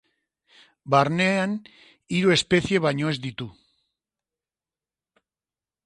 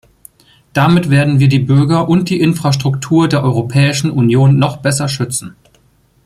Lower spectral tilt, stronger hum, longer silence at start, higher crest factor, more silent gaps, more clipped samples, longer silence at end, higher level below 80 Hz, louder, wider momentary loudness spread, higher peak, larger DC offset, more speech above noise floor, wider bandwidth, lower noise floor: about the same, -5 dB/octave vs -6 dB/octave; neither; about the same, 0.85 s vs 0.75 s; first, 22 dB vs 12 dB; neither; neither; first, 2.35 s vs 0.75 s; second, -58 dBFS vs -46 dBFS; second, -23 LUFS vs -12 LUFS; first, 14 LU vs 6 LU; second, -6 dBFS vs -2 dBFS; neither; first, over 67 dB vs 41 dB; second, 11.5 kHz vs 14 kHz; first, under -90 dBFS vs -53 dBFS